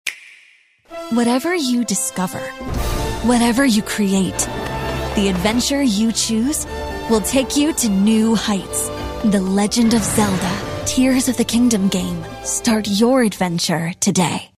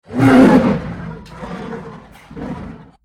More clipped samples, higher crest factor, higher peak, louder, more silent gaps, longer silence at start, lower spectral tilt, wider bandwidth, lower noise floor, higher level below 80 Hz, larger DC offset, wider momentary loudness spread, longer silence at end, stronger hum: neither; about the same, 16 dB vs 16 dB; about the same, -2 dBFS vs 0 dBFS; second, -18 LUFS vs -11 LUFS; neither; about the same, 0.05 s vs 0.1 s; second, -4 dB/octave vs -7.5 dB/octave; first, 16 kHz vs 11.5 kHz; first, -52 dBFS vs -36 dBFS; first, -34 dBFS vs -40 dBFS; neither; second, 9 LU vs 23 LU; second, 0.15 s vs 0.3 s; neither